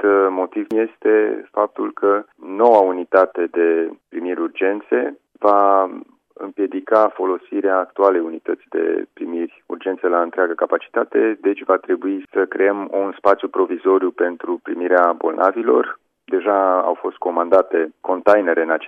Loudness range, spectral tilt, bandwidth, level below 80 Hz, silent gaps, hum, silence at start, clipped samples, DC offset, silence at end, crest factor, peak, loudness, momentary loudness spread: 3 LU; -7 dB/octave; 5.2 kHz; -72 dBFS; none; none; 0 s; under 0.1%; under 0.1%; 0 s; 18 dB; 0 dBFS; -18 LUFS; 10 LU